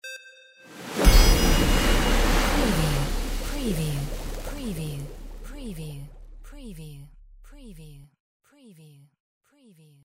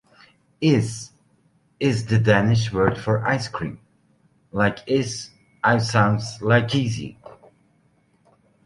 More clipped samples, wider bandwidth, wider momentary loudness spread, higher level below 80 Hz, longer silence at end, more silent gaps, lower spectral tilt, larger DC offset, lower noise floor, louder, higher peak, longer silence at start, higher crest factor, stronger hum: neither; first, 16 kHz vs 11.5 kHz; first, 24 LU vs 14 LU; first, -26 dBFS vs -50 dBFS; first, 2 s vs 1.35 s; neither; second, -4.5 dB/octave vs -6 dB/octave; neither; second, -56 dBFS vs -62 dBFS; second, -25 LUFS vs -22 LUFS; about the same, -4 dBFS vs -2 dBFS; second, 0.05 s vs 0.6 s; about the same, 22 dB vs 20 dB; neither